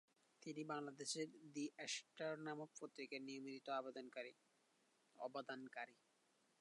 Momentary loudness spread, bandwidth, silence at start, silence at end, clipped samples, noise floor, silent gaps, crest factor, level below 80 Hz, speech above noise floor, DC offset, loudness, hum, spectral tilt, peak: 8 LU; 11 kHz; 0.4 s; 0.65 s; under 0.1%; -81 dBFS; none; 20 dB; under -90 dBFS; 30 dB; under 0.1%; -51 LUFS; none; -3 dB/octave; -34 dBFS